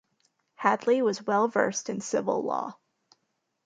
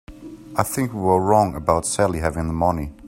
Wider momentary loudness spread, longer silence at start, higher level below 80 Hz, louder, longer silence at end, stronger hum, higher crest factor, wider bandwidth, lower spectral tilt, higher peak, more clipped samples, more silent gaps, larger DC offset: about the same, 8 LU vs 9 LU; first, 0.6 s vs 0.1 s; second, -78 dBFS vs -40 dBFS; second, -27 LUFS vs -21 LUFS; first, 0.95 s vs 0 s; neither; about the same, 22 dB vs 20 dB; second, 9.4 kHz vs 16 kHz; second, -4 dB/octave vs -5.5 dB/octave; second, -8 dBFS vs 0 dBFS; neither; neither; neither